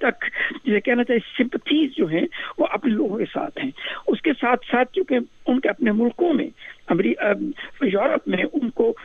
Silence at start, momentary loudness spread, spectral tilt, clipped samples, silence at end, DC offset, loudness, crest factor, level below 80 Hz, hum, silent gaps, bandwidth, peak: 0 s; 7 LU; -7.5 dB/octave; under 0.1%; 0 s; under 0.1%; -22 LUFS; 16 dB; -58 dBFS; none; none; 6.6 kHz; -6 dBFS